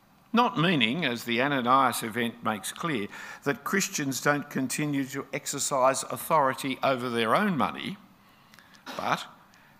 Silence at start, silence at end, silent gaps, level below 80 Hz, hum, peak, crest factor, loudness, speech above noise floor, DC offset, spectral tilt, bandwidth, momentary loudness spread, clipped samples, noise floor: 0.35 s; 0.45 s; none; -72 dBFS; none; -6 dBFS; 22 dB; -27 LUFS; 29 dB; under 0.1%; -4 dB/octave; 16 kHz; 10 LU; under 0.1%; -57 dBFS